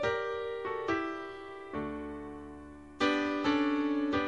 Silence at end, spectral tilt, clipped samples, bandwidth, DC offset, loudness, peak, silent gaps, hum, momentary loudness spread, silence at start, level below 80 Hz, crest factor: 0 s; -5.5 dB/octave; under 0.1%; 9.2 kHz; under 0.1%; -33 LUFS; -16 dBFS; none; none; 16 LU; 0 s; -58 dBFS; 16 dB